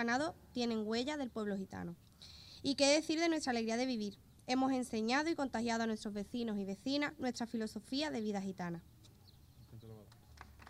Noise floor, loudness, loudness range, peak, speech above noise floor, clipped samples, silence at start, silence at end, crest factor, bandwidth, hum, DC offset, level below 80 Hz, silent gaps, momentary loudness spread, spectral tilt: -62 dBFS; -37 LUFS; 6 LU; -20 dBFS; 24 dB; under 0.1%; 0 s; 0 s; 20 dB; 15.5 kHz; none; under 0.1%; -68 dBFS; none; 20 LU; -4 dB/octave